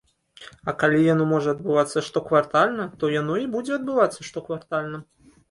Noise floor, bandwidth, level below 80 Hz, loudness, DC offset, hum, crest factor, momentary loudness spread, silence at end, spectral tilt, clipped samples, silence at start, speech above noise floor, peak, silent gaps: -48 dBFS; 11.5 kHz; -62 dBFS; -23 LUFS; under 0.1%; none; 18 dB; 13 LU; 0.45 s; -6 dB/octave; under 0.1%; 0.4 s; 25 dB; -6 dBFS; none